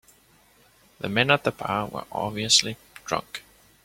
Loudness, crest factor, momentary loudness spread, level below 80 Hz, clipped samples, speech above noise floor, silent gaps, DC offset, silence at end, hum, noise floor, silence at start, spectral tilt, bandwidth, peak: -24 LUFS; 24 dB; 18 LU; -60 dBFS; under 0.1%; 34 dB; none; under 0.1%; 0.45 s; none; -59 dBFS; 1 s; -2.5 dB/octave; 16.5 kHz; -4 dBFS